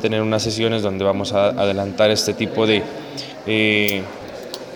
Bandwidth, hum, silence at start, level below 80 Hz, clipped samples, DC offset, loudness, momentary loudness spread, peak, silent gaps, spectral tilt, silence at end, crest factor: over 20 kHz; none; 0 s; -56 dBFS; under 0.1%; under 0.1%; -19 LUFS; 14 LU; -2 dBFS; none; -4.5 dB/octave; 0 s; 18 dB